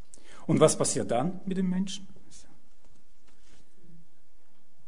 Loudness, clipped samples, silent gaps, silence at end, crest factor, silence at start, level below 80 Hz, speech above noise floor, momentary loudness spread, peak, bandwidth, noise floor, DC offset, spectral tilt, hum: -27 LUFS; under 0.1%; none; 2.5 s; 26 dB; 0.5 s; -64 dBFS; 41 dB; 14 LU; -6 dBFS; 11 kHz; -68 dBFS; 2%; -5 dB/octave; none